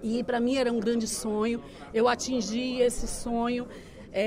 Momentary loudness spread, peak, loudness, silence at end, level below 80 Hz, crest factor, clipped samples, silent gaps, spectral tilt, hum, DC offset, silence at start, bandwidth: 9 LU; -12 dBFS; -28 LUFS; 0 s; -46 dBFS; 16 dB; under 0.1%; none; -4 dB/octave; none; under 0.1%; 0 s; 16 kHz